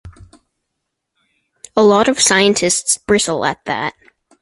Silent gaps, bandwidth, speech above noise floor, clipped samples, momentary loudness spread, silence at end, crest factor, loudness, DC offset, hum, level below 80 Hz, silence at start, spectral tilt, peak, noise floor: none; 11.5 kHz; 61 dB; under 0.1%; 10 LU; 0.5 s; 18 dB; -14 LUFS; under 0.1%; none; -48 dBFS; 0.05 s; -2.5 dB/octave; 0 dBFS; -76 dBFS